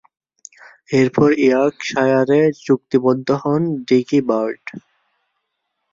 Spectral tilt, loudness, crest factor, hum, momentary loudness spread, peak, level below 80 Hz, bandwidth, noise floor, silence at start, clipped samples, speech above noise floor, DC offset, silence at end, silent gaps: -7 dB/octave; -17 LUFS; 16 dB; none; 6 LU; -2 dBFS; -58 dBFS; 7.6 kHz; -74 dBFS; 0.9 s; under 0.1%; 58 dB; under 0.1%; 1.15 s; none